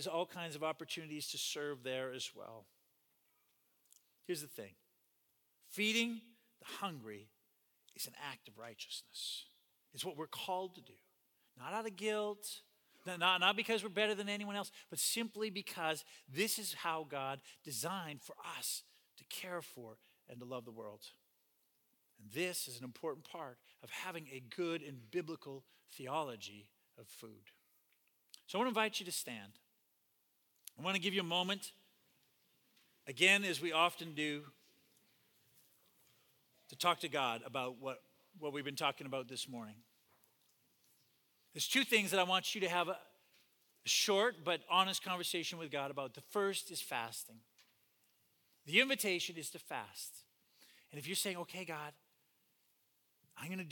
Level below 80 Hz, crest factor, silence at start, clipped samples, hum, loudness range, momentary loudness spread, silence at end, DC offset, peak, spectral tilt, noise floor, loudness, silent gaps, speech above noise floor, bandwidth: under -90 dBFS; 28 dB; 0 s; under 0.1%; none; 11 LU; 20 LU; 0 s; under 0.1%; -14 dBFS; -2.5 dB/octave; -79 dBFS; -38 LUFS; none; 39 dB; 19 kHz